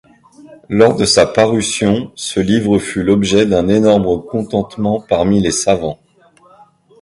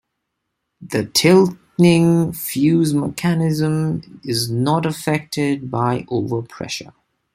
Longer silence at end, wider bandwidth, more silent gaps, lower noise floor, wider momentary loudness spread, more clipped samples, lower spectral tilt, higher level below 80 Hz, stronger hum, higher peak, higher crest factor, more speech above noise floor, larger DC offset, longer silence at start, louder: first, 1.05 s vs 0.5 s; second, 11.5 kHz vs 16 kHz; neither; second, -49 dBFS vs -76 dBFS; second, 8 LU vs 12 LU; neither; about the same, -5 dB/octave vs -5.5 dB/octave; first, -40 dBFS vs -54 dBFS; neither; about the same, 0 dBFS vs -2 dBFS; about the same, 14 dB vs 16 dB; second, 35 dB vs 58 dB; neither; second, 0.45 s vs 0.8 s; first, -14 LUFS vs -18 LUFS